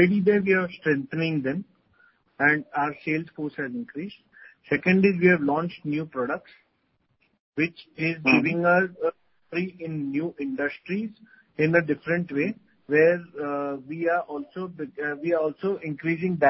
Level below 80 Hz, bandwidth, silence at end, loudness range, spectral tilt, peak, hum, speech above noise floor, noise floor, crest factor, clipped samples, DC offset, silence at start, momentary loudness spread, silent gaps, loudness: -64 dBFS; 5.8 kHz; 0 s; 3 LU; -10.5 dB/octave; -6 dBFS; none; 46 dB; -71 dBFS; 20 dB; under 0.1%; under 0.1%; 0 s; 14 LU; 7.40-7.52 s; -25 LUFS